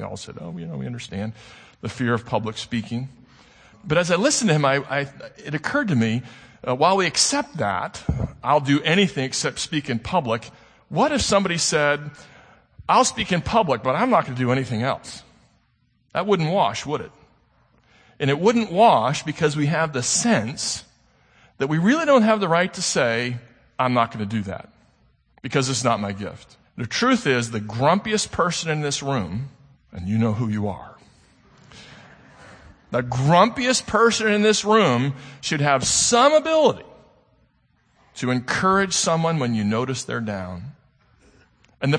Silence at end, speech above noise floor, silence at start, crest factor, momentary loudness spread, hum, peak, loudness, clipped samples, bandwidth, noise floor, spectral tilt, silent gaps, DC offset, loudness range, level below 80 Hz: 0 s; 43 dB; 0 s; 20 dB; 16 LU; none; -2 dBFS; -21 LUFS; under 0.1%; 9.8 kHz; -64 dBFS; -4 dB/octave; none; under 0.1%; 7 LU; -50 dBFS